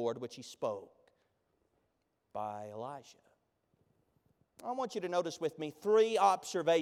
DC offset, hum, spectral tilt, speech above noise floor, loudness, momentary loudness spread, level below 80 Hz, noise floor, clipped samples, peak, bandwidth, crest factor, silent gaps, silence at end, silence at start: under 0.1%; none; -4 dB/octave; 46 dB; -34 LUFS; 17 LU; -84 dBFS; -80 dBFS; under 0.1%; -16 dBFS; 14 kHz; 20 dB; none; 0 s; 0 s